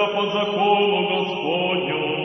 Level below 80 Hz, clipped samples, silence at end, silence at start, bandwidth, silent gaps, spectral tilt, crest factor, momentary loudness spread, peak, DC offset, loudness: -64 dBFS; under 0.1%; 0 s; 0 s; 6.2 kHz; none; -6 dB/octave; 16 dB; 5 LU; -6 dBFS; under 0.1%; -21 LUFS